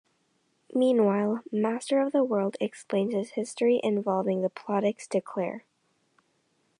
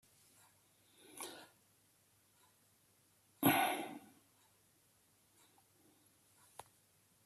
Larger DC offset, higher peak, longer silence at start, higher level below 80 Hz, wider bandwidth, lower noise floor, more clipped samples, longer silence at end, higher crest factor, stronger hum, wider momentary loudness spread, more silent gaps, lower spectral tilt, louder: neither; first, -12 dBFS vs -18 dBFS; second, 0.7 s vs 1.15 s; about the same, -82 dBFS vs -84 dBFS; second, 11 kHz vs 14.5 kHz; about the same, -72 dBFS vs -73 dBFS; neither; second, 1.2 s vs 3.25 s; second, 16 dB vs 28 dB; neither; second, 9 LU vs 26 LU; neither; first, -6.5 dB/octave vs -3.5 dB/octave; first, -27 LUFS vs -37 LUFS